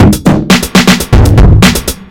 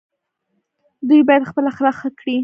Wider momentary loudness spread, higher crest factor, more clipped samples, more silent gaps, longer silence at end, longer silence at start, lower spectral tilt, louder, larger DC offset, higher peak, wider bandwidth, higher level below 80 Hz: second, 3 LU vs 12 LU; second, 6 dB vs 16 dB; first, 10% vs under 0.1%; neither; about the same, 0.05 s vs 0 s; second, 0 s vs 1 s; second, -5 dB/octave vs -7 dB/octave; first, -6 LUFS vs -16 LUFS; neither; about the same, 0 dBFS vs 0 dBFS; first, 18.5 kHz vs 6 kHz; first, -12 dBFS vs -64 dBFS